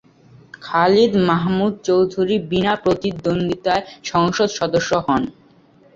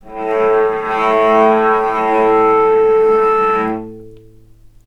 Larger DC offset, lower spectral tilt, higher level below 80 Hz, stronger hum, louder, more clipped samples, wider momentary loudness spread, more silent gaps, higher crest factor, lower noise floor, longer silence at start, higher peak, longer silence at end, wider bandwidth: neither; about the same, -5.5 dB/octave vs -6.5 dB/octave; about the same, -50 dBFS vs -46 dBFS; neither; second, -18 LUFS vs -13 LUFS; neither; about the same, 7 LU vs 7 LU; neither; about the same, 16 dB vs 14 dB; first, -51 dBFS vs -43 dBFS; first, 0.6 s vs 0.05 s; about the same, -2 dBFS vs 0 dBFS; about the same, 0.65 s vs 0.7 s; first, 7.6 kHz vs 6.4 kHz